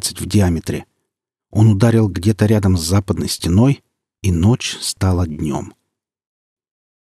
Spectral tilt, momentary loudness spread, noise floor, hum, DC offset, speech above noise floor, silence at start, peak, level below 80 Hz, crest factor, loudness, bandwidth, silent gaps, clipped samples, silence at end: -6 dB/octave; 10 LU; -79 dBFS; none; under 0.1%; 63 dB; 0 s; 0 dBFS; -38 dBFS; 16 dB; -17 LUFS; 14.5 kHz; none; under 0.1%; 1.3 s